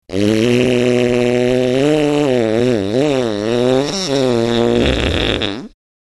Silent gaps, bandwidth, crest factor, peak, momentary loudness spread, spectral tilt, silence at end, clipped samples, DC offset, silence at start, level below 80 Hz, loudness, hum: none; 12 kHz; 14 dB; 0 dBFS; 4 LU; -5.5 dB/octave; 0.5 s; under 0.1%; under 0.1%; 0.1 s; -32 dBFS; -15 LUFS; none